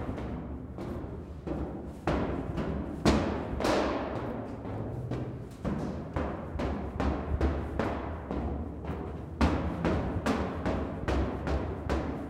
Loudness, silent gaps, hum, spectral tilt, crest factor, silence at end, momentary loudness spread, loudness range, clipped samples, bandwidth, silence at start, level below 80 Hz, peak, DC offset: -33 LUFS; none; none; -7 dB/octave; 20 dB; 0 s; 9 LU; 3 LU; under 0.1%; 12.5 kHz; 0 s; -40 dBFS; -12 dBFS; under 0.1%